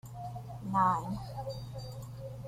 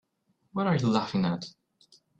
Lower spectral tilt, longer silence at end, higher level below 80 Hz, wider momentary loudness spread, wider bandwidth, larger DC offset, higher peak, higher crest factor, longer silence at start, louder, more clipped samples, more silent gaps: about the same, -7 dB/octave vs -7 dB/octave; second, 0 s vs 0.7 s; first, -56 dBFS vs -64 dBFS; first, 15 LU vs 12 LU; first, 16 kHz vs 8.2 kHz; neither; second, -16 dBFS vs -12 dBFS; about the same, 20 dB vs 18 dB; second, 0.05 s vs 0.55 s; second, -35 LUFS vs -28 LUFS; neither; neither